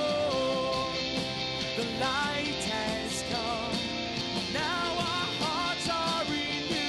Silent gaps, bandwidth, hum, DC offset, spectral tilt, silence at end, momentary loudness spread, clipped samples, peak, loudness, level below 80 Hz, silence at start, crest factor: none; 12 kHz; none; under 0.1%; -3.5 dB/octave; 0 s; 3 LU; under 0.1%; -18 dBFS; -30 LUFS; -54 dBFS; 0 s; 14 dB